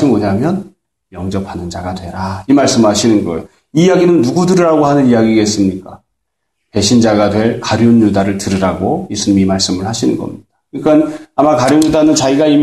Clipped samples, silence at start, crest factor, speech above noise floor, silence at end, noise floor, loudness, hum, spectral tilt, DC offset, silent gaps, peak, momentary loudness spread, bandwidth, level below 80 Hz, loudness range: under 0.1%; 0 s; 12 dB; 61 dB; 0 s; -72 dBFS; -12 LUFS; none; -5.5 dB/octave; 0.2%; none; 0 dBFS; 12 LU; 12.5 kHz; -44 dBFS; 4 LU